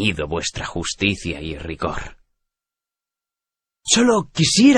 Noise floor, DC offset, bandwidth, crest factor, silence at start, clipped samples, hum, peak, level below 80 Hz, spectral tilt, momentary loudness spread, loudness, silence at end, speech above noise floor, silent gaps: -88 dBFS; under 0.1%; 10.5 kHz; 18 dB; 0 s; under 0.1%; none; -2 dBFS; -42 dBFS; -3.5 dB/octave; 15 LU; -20 LUFS; 0 s; 70 dB; none